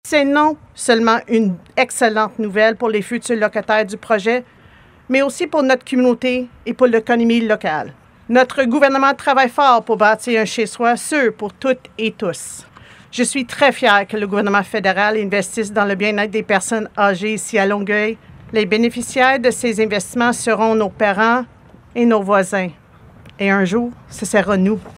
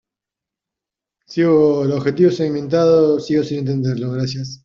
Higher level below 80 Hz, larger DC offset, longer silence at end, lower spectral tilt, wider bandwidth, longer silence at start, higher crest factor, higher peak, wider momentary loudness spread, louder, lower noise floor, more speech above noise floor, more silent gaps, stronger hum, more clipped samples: about the same, -56 dBFS vs -56 dBFS; neither; about the same, 0.05 s vs 0.1 s; second, -4 dB/octave vs -7.5 dB/octave; first, 15.5 kHz vs 7.4 kHz; second, 0.05 s vs 1.3 s; about the same, 16 dB vs 14 dB; first, 0 dBFS vs -4 dBFS; about the same, 8 LU vs 9 LU; about the same, -16 LUFS vs -17 LUFS; second, -46 dBFS vs -86 dBFS; second, 30 dB vs 70 dB; neither; neither; neither